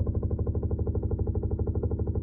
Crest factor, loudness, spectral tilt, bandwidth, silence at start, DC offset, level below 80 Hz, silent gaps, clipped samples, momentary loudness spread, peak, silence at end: 12 dB; -30 LUFS; -13.5 dB/octave; 1.5 kHz; 0 s; under 0.1%; -32 dBFS; none; under 0.1%; 0 LU; -16 dBFS; 0 s